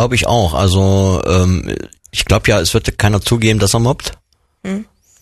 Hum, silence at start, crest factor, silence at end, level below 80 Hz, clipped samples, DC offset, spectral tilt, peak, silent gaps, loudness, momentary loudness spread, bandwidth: none; 0 s; 14 dB; 0.4 s; -28 dBFS; under 0.1%; under 0.1%; -5 dB/octave; 0 dBFS; none; -14 LUFS; 12 LU; 13 kHz